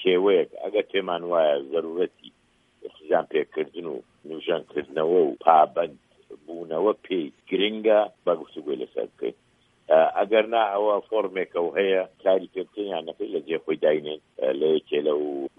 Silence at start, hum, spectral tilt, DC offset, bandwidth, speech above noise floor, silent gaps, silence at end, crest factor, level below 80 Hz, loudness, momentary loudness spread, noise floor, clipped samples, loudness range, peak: 0 s; none; -7 dB/octave; under 0.1%; 3.8 kHz; 35 dB; none; 0.1 s; 22 dB; -74 dBFS; -24 LUFS; 12 LU; -59 dBFS; under 0.1%; 4 LU; -2 dBFS